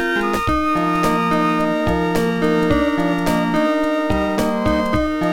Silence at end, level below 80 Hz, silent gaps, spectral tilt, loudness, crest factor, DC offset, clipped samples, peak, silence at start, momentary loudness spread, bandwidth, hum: 0 s; -34 dBFS; none; -6 dB/octave; -18 LUFS; 14 dB; 1%; under 0.1%; -4 dBFS; 0 s; 2 LU; 17 kHz; none